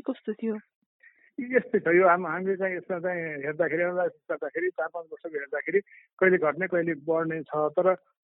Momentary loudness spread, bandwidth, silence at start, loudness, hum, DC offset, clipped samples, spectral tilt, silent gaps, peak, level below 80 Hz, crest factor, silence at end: 12 LU; 3.9 kHz; 0.05 s; -27 LUFS; none; under 0.1%; under 0.1%; -6.5 dB/octave; 0.75-1.00 s, 6.13-6.17 s; -8 dBFS; -78 dBFS; 18 dB; 0.3 s